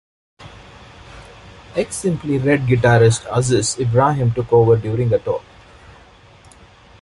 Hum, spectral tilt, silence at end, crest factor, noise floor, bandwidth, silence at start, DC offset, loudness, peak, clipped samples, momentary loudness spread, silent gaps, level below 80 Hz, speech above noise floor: none; -6 dB/octave; 1.6 s; 16 dB; -46 dBFS; 11.5 kHz; 0.4 s; under 0.1%; -17 LUFS; -2 dBFS; under 0.1%; 10 LU; none; -44 dBFS; 30 dB